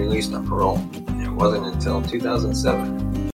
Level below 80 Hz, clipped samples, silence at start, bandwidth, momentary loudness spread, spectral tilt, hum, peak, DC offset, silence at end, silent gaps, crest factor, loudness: -30 dBFS; under 0.1%; 0 s; 16.5 kHz; 6 LU; -6 dB/octave; none; -4 dBFS; under 0.1%; 0.05 s; none; 16 dB; -23 LUFS